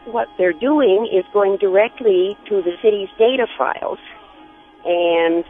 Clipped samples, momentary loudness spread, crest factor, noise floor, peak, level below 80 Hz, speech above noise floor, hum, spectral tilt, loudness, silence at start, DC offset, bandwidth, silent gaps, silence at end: under 0.1%; 7 LU; 16 dB; -44 dBFS; -2 dBFS; -58 dBFS; 28 dB; none; -8 dB/octave; -17 LUFS; 0.05 s; under 0.1%; 3.8 kHz; none; 0.05 s